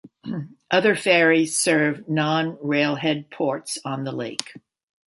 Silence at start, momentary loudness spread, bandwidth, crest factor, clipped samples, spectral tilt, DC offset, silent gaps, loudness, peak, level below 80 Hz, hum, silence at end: 0.05 s; 14 LU; 12 kHz; 20 dB; under 0.1%; -4 dB/octave; under 0.1%; none; -21 LUFS; -2 dBFS; -70 dBFS; none; 0.5 s